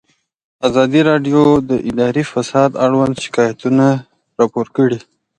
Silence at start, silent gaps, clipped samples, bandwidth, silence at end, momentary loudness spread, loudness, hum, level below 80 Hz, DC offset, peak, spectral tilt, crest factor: 0.6 s; none; under 0.1%; 9.6 kHz; 0.4 s; 6 LU; -14 LUFS; none; -50 dBFS; under 0.1%; 0 dBFS; -6.5 dB/octave; 14 dB